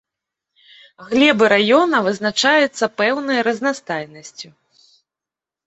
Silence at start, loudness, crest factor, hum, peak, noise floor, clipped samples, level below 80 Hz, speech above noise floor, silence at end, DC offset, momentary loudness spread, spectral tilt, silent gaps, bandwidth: 1 s; -16 LUFS; 18 dB; none; 0 dBFS; -88 dBFS; under 0.1%; -64 dBFS; 71 dB; 1.25 s; under 0.1%; 21 LU; -3.5 dB/octave; none; 8.2 kHz